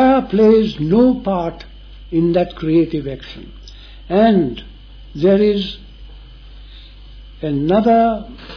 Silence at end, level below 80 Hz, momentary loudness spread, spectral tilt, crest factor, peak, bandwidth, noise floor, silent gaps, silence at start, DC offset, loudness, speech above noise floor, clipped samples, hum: 0 s; -38 dBFS; 20 LU; -9 dB/octave; 14 dB; -2 dBFS; 5.4 kHz; -37 dBFS; none; 0 s; under 0.1%; -16 LUFS; 22 dB; under 0.1%; none